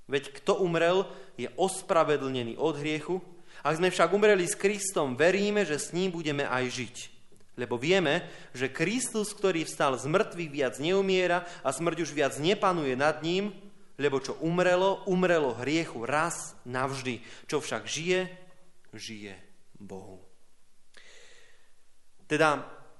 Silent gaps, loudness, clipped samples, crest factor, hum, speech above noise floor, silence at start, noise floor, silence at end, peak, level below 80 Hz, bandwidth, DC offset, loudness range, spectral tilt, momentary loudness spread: none; -28 LUFS; under 0.1%; 20 dB; none; 22 dB; 0 s; -50 dBFS; 0 s; -8 dBFS; -64 dBFS; 11.5 kHz; under 0.1%; 8 LU; -4.5 dB/octave; 13 LU